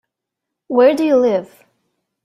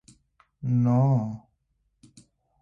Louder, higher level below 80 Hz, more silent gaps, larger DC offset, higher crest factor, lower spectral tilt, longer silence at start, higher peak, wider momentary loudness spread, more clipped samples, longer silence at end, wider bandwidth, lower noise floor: first, -15 LUFS vs -25 LUFS; about the same, -64 dBFS vs -62 dBFS; neither; neither; about the same, 16 dB vs 16 dB; second, -6 dB/octave vs -10.5 dB/octave; about the same, 0.7 s vs 0.6 s; first, -2 dBFS vs -12 dBFS; second, 8 LU vs 15 LU; neither; second, 0.8 s vs 1.25 s; first, 12.5 kHz vs 9.2 kHz; first, -81 dBFS vs -73 dBFS